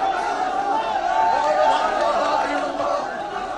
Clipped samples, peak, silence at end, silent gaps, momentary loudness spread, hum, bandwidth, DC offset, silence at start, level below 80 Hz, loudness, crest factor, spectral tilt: under 0.1%; -6 dBFS; 0 s; none; 6 LU; none; 11 kHz; under 0.1%; 0 s; -52 dBFS; -21 LUFS; 14 dB; -3 dB/octave